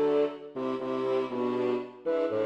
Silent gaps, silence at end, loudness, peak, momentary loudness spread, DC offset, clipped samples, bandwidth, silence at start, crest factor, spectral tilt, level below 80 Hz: none; 0 s; -30 LUFS; -16 dBFS; 4 LU; under 0.1%; under 0.1%; 8 kHz; 0 s; 12 dB; -7 dB/octave; -72 dBFS